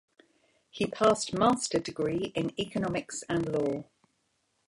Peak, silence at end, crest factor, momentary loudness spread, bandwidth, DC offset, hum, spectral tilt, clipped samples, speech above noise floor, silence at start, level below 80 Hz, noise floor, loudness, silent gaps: -10 dBFS; 0.85 s; 20 dB; 9 LU; 11.5 kHz; under 0.1%; none; -4.5 dB/octave; under 0.1%; 46 dB; 0.75 s; -62 dBFS; -75 dBFS; -30 LUFS; none